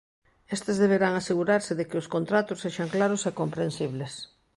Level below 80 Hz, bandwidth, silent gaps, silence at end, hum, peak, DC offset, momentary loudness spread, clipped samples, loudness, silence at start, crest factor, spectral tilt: -64 dBFS; 11.5 kHz; none; 0.3 s; none; -8 dBFS; under 0.1%; 10 LU; under 0.1%; -27 LUFS; 0.5 s; 18 dB; -5.5 dB/octave